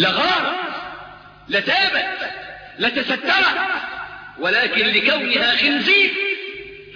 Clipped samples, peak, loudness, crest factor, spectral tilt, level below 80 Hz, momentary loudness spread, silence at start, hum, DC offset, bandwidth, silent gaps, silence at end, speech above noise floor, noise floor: under 0.1%; -4 dBFS; -17 LUFS; 16 dB; -4 dB/octave; -56 dBFS; 17 LU; 0 s; none; under 0.1%; 5.4 kHz; none; 0 s; 21 dB; -40 dBFS